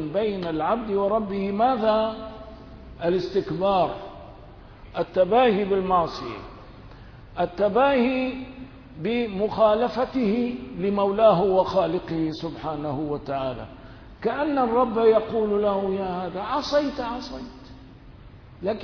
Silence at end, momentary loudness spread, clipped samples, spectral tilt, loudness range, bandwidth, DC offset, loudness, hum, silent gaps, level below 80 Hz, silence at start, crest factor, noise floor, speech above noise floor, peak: 0 s; 18 LU; under 0.1%; -7.5 dB/octave; 5 LU; 5.4 kHz; under 0.1%; -24 LUFS; none; none; -48 dBFS; 0 s; 18 dB; -46 dBFS; 23 dB; -6 dBFS